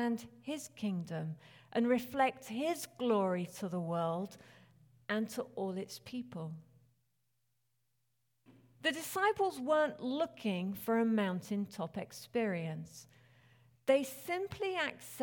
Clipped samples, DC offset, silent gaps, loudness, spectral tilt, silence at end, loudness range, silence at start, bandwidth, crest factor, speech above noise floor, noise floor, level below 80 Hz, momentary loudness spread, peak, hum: under 0.1%; under 0.1%; none; -36 LUFS; -5.5 dB/octave; 0 s; 9 LU; 0 s; 19 kHz; 20 dB; 47 dB; -83 dBFS; -76 dBFS; 12 LU; -18 dBFS; none